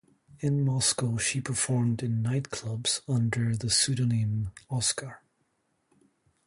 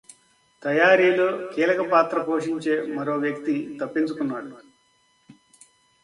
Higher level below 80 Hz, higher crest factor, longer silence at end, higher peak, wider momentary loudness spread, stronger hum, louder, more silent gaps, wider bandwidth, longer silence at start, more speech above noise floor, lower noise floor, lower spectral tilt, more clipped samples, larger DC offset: first, -56 dBFS vs -72 dBFS; about the same, 18 dB vs 20 dB; first, 1.3 s vs 0.7 s; second, -12 dBFS vs -4 dBFS; about the same, 9 LU vs 11 LU; neither; second, -28 LUFS vs -22 LUFS; neither; about the same, 11.5 kHz vs 11.5 kHz; second, 0.4 s vs 0.6 s; first, 46 dB vs 41 dB; first, -74 dBFS vs -64 dBFS; second, -4 dB/octave vs -5.5 dB/octave; neither; neither